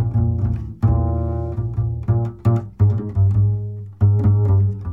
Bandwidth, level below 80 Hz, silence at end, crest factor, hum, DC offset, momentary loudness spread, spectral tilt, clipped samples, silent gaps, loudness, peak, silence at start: 2.2 kHz; -30 dBFS; 0 s; 12 dB; none; 0.2%; 7 LU; -12 dB/octave; under 0.1%; none; -19 LUFS; -6 dBFS; 0 s